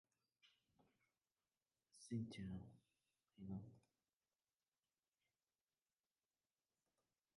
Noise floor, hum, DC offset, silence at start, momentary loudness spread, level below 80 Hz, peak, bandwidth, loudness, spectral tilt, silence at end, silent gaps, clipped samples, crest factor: under -90 dBFS; none; under 0.1%; 0.45 s; 16 LU; -78 dBFS; -36 dBFS; 10.5 kHz; -53 LUFS; -6.5 dB/octave; 3.6 s; none; under 0.1%; 22 dB